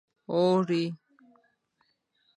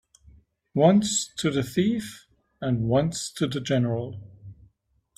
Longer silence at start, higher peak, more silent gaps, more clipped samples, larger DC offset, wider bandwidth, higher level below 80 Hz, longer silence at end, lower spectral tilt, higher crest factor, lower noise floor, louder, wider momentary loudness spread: second, 0.3 s vs 0.75 s; second, -14 dBFS vs -4 dBFS; neither; neither; neither; second, 10.5 kHz vs 15 kHz; second, -78 dBFS vs -56 dBFS; first, 1.4 s vs 0.65 s; first, -7.5 dB/octave vs -5.5 dB/octave; about the same, 18 dB vs 22 dB; first, -74 dBFS vs -66 dBFS; about the same, -27 LUFS vs -25 LUFS; about the same, 12 LU vs 13 LU